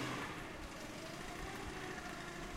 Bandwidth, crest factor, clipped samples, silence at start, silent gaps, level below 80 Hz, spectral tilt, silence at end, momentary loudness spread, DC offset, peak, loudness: 16 kHz; 18 dB; under 0.1%; 0 s; none; -56 dBFS; -4 dB/octave; 0 s; 4 LU; under 0.1%; -28 dBFS; -46 LUFS